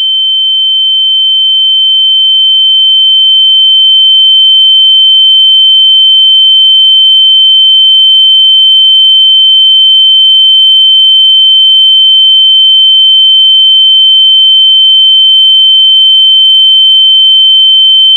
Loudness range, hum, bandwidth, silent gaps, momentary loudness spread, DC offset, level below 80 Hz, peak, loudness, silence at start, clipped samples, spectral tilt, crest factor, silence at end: 1 LU; none; 16.5 kHz; none; 2 LU; under 0.1%; under -90 dBFS; 0 dBFS; 0 LUFS; 0 s; 4%; 9 dB/octave; 4 dB; 0 s